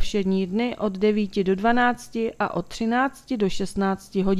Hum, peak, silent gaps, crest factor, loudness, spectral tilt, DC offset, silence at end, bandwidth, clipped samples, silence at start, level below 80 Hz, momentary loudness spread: none; -6 dBFS; none; 18 dB; -24 LUFS; -6 dB/octave; under 0.1%; 0 s; 13.5 kHz; under 0.1%; 0 s; -44 dBFS; 6 LU